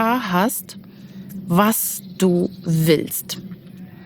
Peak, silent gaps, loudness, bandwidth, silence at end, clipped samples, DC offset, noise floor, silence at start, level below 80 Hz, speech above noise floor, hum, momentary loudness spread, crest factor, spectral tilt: -2 dBFS; none; -20 LUFS; over 20 kHz; 0 s; under 0.1%; under 0.1%; -39 dBFS; 0 s; -58 dBFS; 19 dB; none; 21 LU; 18 dB; -5 dB/octave